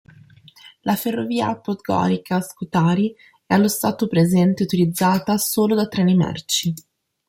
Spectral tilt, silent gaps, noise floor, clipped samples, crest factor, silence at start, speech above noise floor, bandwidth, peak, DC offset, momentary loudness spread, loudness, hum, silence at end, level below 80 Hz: -5.5 dB/octave; none; -48 dBFS; under 0.1%; 16 dB; 0.65 s; 29 dB; 16.5 kHz; -4 dBFS; under 0.1%; 7 LU; -20 LUFS; none; 0.5 s; -58 dBFS